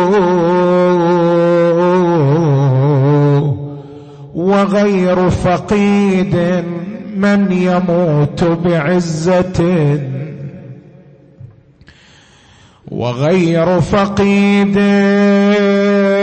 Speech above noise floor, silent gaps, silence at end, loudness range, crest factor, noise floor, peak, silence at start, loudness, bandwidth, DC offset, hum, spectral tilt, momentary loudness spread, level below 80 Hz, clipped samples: 33 dB; none; 0 s; 8 LU; 10 dB; -45 dBFS; -2 dBFS; 0 s; -12 LUFS; 8.6 kHz; under 0.1%; none; -7.5 dB/octave; 10 LU; -40 dBFS; under 0.1%